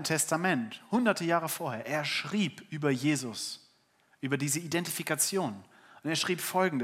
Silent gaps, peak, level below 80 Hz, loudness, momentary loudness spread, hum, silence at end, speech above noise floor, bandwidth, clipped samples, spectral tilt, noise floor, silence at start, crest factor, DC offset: none; -10 dBFS; -82 dBFS; -31 LUFS; 10 LU; none; 0 s; 37 dB; 16 kHz; under 0.1%; -3.5 dB/octave; -68 dBFS; 0 s; 22 dB; under 0.1%